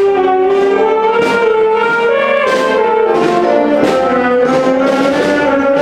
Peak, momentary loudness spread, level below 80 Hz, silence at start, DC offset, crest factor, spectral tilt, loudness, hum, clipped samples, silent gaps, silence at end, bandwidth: 0 dBFS; 1 LU; -48 dBFS; 0 s; under 0.1%; 10 dB; -5 dB/octave; -11 LUFS; none; under 0.1%; none; 0 s; 12.5 kHz